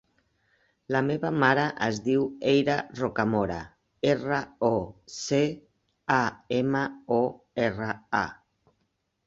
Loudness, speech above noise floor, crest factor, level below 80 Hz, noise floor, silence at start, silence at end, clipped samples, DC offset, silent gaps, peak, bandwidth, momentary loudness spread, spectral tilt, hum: -27 LUFS; 49 dB; 22 dB; -58 dBFS; -76 dBFS; 0.9 s; 0.95 s; under 0.1%; under 0.1%; none; -6 dBFS; 8 kHz; 9 LU; -5.5 dB/octave; none